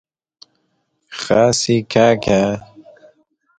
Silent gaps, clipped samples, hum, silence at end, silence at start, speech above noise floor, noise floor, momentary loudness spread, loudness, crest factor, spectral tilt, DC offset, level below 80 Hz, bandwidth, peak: none; under 0.1%; none; 0.95 s; 1.1 s; 53 dB; -67 dBFS; 15 LU; -15 LUFS; 18 dB; -4.5 dB/octave; under 0.1%; -48 dBFS; 9.6 kHz; 0 dBFS